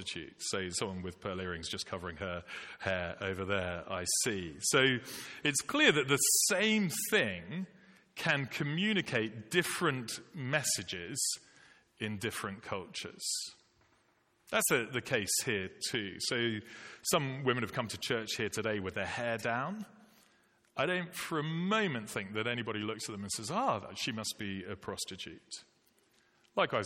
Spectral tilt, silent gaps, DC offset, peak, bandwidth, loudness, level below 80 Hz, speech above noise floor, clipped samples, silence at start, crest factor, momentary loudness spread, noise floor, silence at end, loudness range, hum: -3 dB/octave; none; under 0.1%; -14 dBFS; 16.5 kHz; -33 LUFS; -68 dBFS; 37 dB; under 0.1%; 0 s; 22 dB; 13 LU; -72 dBFS; 0 s; 9 LU; none